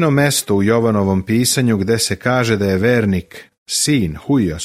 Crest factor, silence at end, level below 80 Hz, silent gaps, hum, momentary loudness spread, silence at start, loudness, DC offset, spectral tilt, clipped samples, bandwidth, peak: 14 dB; 0 s; -42 dBFS; 3.58-3.66 s; none; 3 LU; 0 s; -16 LUFS; under 0.1%; -4.5 dB/octave; under 0.1%; 15.5 kHz; -2 dBFS